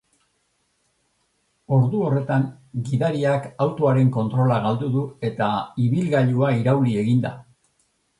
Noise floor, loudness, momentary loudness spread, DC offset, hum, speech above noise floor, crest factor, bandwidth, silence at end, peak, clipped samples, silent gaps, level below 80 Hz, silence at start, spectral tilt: -69 dBFS; -21 LUFS; 6 LU; under 0.1%; none; 49 dB; 16 dB; 10.5 kHz; 0.8 s; -6 dBFS; under 0.1%; none; -58 dBFS; 1.7 s; -8.5 dB/octave